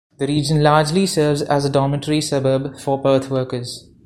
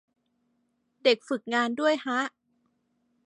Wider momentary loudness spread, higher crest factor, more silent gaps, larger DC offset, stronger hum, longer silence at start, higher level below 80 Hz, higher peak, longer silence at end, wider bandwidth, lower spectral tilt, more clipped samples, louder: first, 8 LU vs 5 LU; about the same, 18 dB vs 22 dB; neither; neither; neither; second, 0.2 s vs 1.05 s; first, -48 dBFS vs -86 dBFS; first, 0 dBFS vs -10 dBFS; second, 0.25 s vs 0.95 s; first, 14.5 kHz vs 11 kHz; first, -5.5 dB/octave vs -3 dB/octave; neither; first, -18 LUFS vs -27 LUFS